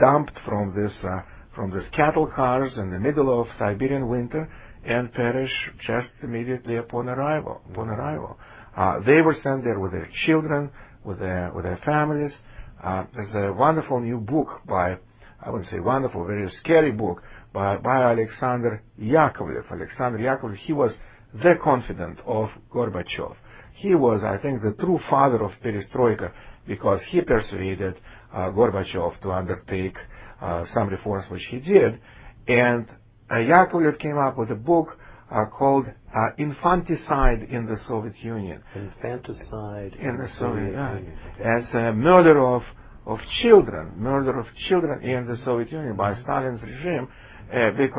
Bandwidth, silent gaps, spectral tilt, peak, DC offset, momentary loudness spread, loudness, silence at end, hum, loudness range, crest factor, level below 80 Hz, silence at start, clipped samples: 4 kHz; none; -11 dB/octave; 0 dBFS; under 0.1%; 15 LU; -23 LUFS; 0 s; none; 6 LU; 22 dB; -42 dBFS; 0 s; under 0.1%